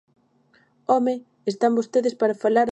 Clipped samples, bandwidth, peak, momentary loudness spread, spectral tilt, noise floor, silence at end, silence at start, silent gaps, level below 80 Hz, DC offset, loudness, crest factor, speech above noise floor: under 0.1%; 8.8 kHz; -6 dBFS; 9 LU; -5.5 dB/octave; -61 dBFS; 0 s; 0.9 s; none; -80 dBFS; under 0.1%; -22 LUFS; 18 dB; 40 dB